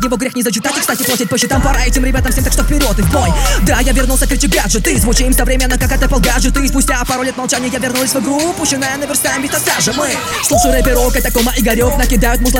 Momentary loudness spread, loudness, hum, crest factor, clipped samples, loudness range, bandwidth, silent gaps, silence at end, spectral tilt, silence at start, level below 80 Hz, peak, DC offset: 3 LU; -13 LUFS; none; 12 dB; under 0.1%; 1 LU; 17.5 kHz; none; 0 s; -3.5 dB/octave; 0 s; -16 dBFS; 0 dBFS; under 0.1%